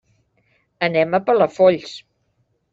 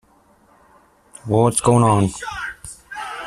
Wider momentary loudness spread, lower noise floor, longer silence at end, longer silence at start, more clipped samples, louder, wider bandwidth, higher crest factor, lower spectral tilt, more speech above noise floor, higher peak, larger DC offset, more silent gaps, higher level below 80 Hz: about the same, 17 LU vs 19 LU; first, -67 dBFS vs -55 dBFS; first, 0.75 s vs 0 s; second, 0.8 s vs 1.25 s; neither; about the same, -18 LUFS vs -18 LUFS; second, 7.8 kHz vs 14 kHz; about the same, 18 dB vs 18 dB; about the same, -6 dB/octave vs -5.5 dB/octave; first, 50 dB vs 39 dB; about the same, -2 dBFS vs -2 dBFS; neither; neither; second, -62 dBFS vs -48 dBFS